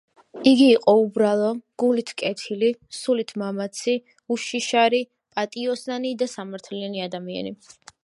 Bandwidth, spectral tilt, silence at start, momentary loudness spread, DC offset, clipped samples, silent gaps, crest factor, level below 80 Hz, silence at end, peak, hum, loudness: 11.5 kHz; -4.5 dB/octave; 0.35 s; 14 LU; under 0.1%; under 0.1%; none; 20 dB; -74 dBFS; 0.5 s; -2 dBFS; none; -23 LUFS